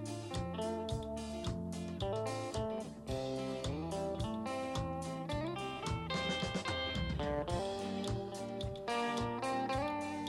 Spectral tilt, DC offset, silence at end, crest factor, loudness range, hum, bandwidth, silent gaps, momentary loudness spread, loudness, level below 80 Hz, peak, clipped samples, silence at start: -5.5 dB/octave; under 0.1%; 0 s; 16 dB; 2 LU; none; 12.5 kHz; none; 5 LU; -39 LUFS; -52 dBFS; -24 dBFS; under 0.1%; 0 s